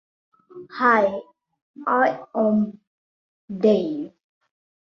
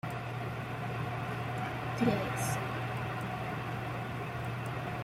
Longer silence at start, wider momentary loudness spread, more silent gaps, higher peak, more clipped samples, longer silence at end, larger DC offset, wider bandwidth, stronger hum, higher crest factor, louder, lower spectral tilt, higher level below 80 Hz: first, 0.55 s vs 0.05 s; first, 17 LU vs 7 LU; first, 1.62-1.74 s, 2.87-3.48 s vs none; first, -4 dBFS vs -16 dBFS; neither; first, 0.8 s vs 0 s; neither; second, 6.6 kHz vs 16 kHz; neither; about the same, 20 dB vs 20 dB; first, -21 LUFS vs -36 LUFS; first, -8 dB/octave vs -6 dB/octave; second, -68 dBFS vs -56 dBFS